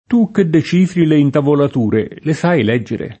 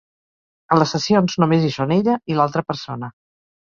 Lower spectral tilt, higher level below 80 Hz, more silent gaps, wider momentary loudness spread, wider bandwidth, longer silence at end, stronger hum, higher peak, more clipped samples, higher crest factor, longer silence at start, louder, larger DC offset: first, -8 dB/octave vs -6.5 dB/octave; first, -52 dBFS vs -58 dBFS; neither; second, 6 LU vs 12 LU; first, 8.6 kHz vs 7.4 kHz; second, 0.05 s vs 0.6 s; neither; about the same, 0 dBFS vs -2 dBFS; neither; second, 12 dB vs 18 dB; second, 0.1 s vs 0.7 s; first, -14 LUFS vs -19 LUFS; neither